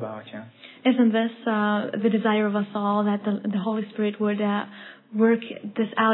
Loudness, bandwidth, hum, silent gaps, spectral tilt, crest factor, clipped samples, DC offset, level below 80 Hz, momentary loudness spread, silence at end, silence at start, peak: -24 LUFS; 4.1 kHz; none; none; -10.5 dB/octave; 16 dB; under 0.1%; under 0.1%; -86 dBFS; 14 LU; 0 s; 0 s; -8 dBFS